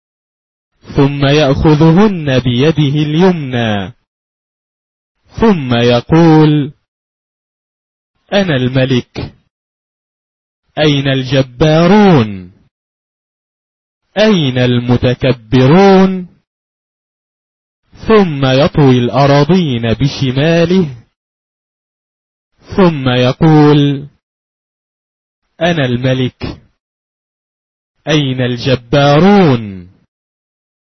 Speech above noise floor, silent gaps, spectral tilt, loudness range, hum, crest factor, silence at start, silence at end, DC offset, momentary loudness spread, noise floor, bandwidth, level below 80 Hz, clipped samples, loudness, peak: over 81 dB; 4.07-5.15 s, 6.88-8.14 s, 9.50-10.63 s, 12.71-14.01 s, 16.47-17.83 s, 21.16-22.51 s, 24.23-25.42 s, 26.80-27.95 s; -7.5 dB/octave; 6 LU; none; 12 dB; 0.9 s; 1.15 s; 0.3%; 12 LU; under -90 dBFS; 6.4 kHz; -36 dBFS; under 0.1%; -10 LUFS; 0 dBFS